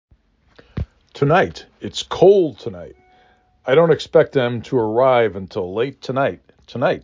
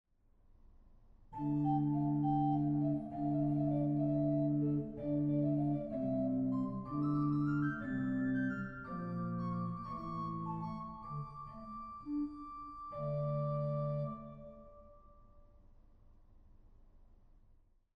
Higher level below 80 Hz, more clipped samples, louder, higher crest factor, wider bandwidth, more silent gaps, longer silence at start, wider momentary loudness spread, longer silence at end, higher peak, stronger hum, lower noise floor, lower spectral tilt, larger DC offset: first, -44 dBFS vs -60 dBFS; neither; first, -18 LUFS vs -37 LUFS; about the same, 18 dB vs 14 dB; first, 7.6 kHz vs 5 kHz; neither; about the same, 0.75 s vs 0.8 s; first, 18 LU vs 14 LU; second, 0.05 s vs 0.95 s; first, -2 dBFS vs -24 dBFS; neither; second, -57 dBFS vs -67 dBFS; second, -6.5 dB/octave vs -11.5 dB/octave; neither